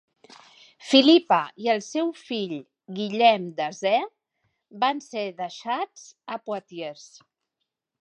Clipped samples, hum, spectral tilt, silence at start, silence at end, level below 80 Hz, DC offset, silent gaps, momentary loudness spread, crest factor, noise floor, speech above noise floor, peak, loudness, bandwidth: under 0.1%; none; -4 dB/octave; 0.85 s; 1 s; -84 dBFS; under 0.1%; none; 18 LU; 24 dB; -82 dBFS; 58 dB; -2 dBFS; -24 LUFS; 9.8 kHz